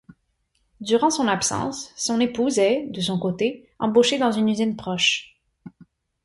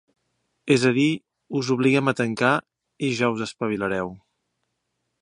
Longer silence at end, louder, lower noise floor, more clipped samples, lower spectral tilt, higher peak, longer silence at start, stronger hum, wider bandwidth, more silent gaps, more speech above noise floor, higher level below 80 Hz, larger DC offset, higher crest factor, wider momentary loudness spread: second, 0.55 s vs 1.05 s; about the same, -22 LUFS vs -23 LUFS; second, -70 dBFS vs -77 dBFS; neither; second, -3.5 dB/octave vs -5.5 dB/octave; about the same, -6 dBFS vs -4 dBFS; first, 0.8 s vs 0.65 s; neither; about the same, 11.5 kHz vs 11 kHz; neither; second, 49 dB vs 55 dB; about the same, -60 dBFS vs -62 dBFS; neither; about the same, 18 dB vs 20 dB; about the same, 8 LU vs 10 LU